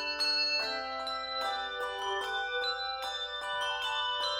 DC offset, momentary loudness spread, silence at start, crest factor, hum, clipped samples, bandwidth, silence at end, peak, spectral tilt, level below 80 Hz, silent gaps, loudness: under 0.1%; 7 LU; 0 s; 14 dB; none; under 0.1%; 16 kHz; 0 s; -20 dBFS; 0 dB/octave; -64 dBFS; none; -32 LUFS